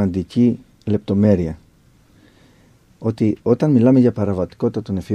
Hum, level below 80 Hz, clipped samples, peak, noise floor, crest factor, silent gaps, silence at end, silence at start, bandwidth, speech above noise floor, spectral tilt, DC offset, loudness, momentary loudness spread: none; -48 dBFS; under 0.1%; -2 dBFS; -53 dBFS; 16 dB; none; 0 s; 0 s; 9 kHz; 36 dB; -9.5 dB/octave; under 0.1%; -18 LUFS; 12 LU